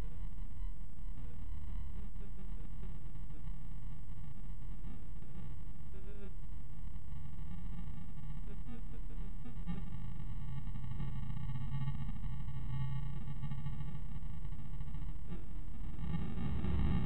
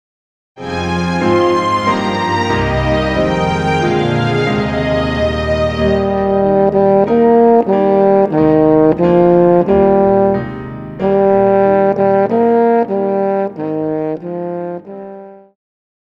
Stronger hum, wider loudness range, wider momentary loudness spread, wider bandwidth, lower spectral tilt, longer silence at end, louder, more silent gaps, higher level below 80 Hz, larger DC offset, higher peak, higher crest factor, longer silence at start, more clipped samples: neither; about the same, 7 LU vs 5 LU; about the same, 10 LU vs 11 LU; about the same, 8.4 kHz vs 9.2 kHz; about the same, -8 dB/octave vs -7.5 dB/octave; second, 0 s vs 0.7 s; second, -46 LUFS vs -13 LUFS; neither; second, -46 dBFS vs -34 dBFS; first, 3% vs under 0.1%; second, -22 dBFS vs 0 dBFS; first, 20 dB vs 12 dB; second, 0 s vs 0.55 s; neither